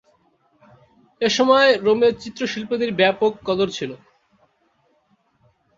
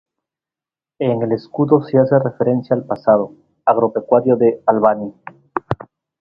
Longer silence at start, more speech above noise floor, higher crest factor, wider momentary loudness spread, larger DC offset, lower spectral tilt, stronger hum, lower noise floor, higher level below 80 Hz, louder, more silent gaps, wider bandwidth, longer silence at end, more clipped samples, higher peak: first, 1.2 s vs 1 s; second, 45 dB vs 74 dB; about the same, 20 dB vs 16 dB; about the same, 12 LU vs 13 LU; neither; second, -4 dB/octave vs -11 dB/octave; neither; second, -64 dBFS vs -90 dBFS; second, -60 dBFS vs -54 dBFS; about the same, -19 LUFS vs -17 LUFS; neither; first, 7.6 kHz vs 5.6 kHz; first, 1.85 s vs 0.45 s; neither; about the same, -2 dBFS vs 0 dBFS